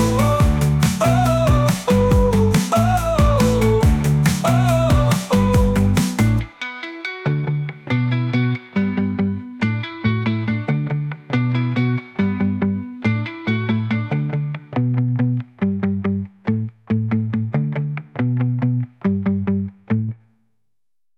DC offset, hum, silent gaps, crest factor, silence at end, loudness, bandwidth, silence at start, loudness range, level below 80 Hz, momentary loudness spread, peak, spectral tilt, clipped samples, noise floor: under 0.1%; none; none; 12 dB; 1.05 s; -19 LUFS; 17.5 kHz; 0 s; 6 LU; -30 dBFS; 8 LU; -6 dBFS; -7 dB/octave; under 0.1%; -83 dBFS